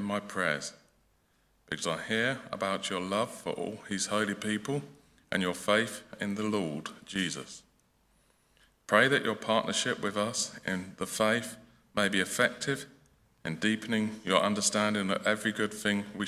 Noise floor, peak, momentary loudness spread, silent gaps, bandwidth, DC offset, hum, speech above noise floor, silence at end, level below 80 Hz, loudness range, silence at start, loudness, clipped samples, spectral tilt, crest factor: -70 dBFS; -8 dBFS; 10 LU; none; 16 kHz; under 0.1%; none; 39 dB; 0 s; -66 dBFS; 4 LU; 0 s; -31 LUFS; under 0.1%; -3.5 dB/octave; 24 dB